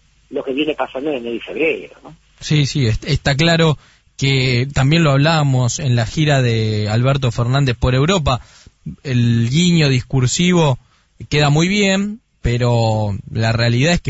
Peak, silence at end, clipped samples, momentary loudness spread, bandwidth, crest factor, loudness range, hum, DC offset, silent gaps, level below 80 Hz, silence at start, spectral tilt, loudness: -2 dBFS; 0 s; under 0.1%; 10 LU; 8 kHz; 14 dB; 3 LU; none; under 0.1%; none; -34 dBFS; 0.3 s; -5.5 dB/octave; -16 LUFS